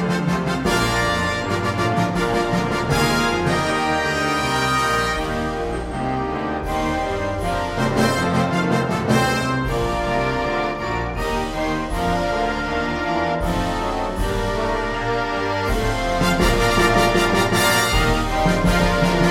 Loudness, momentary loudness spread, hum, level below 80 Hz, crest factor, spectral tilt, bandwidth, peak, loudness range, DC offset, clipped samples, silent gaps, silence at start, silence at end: -20 LUFS; 7 LU; none; -30 dBFS; 16 dB; -5 dB/octave; 16.5 kHz; -4 dBFS; 4 LU; under 0.1%; under 0.1%; none; 0 s; 0 s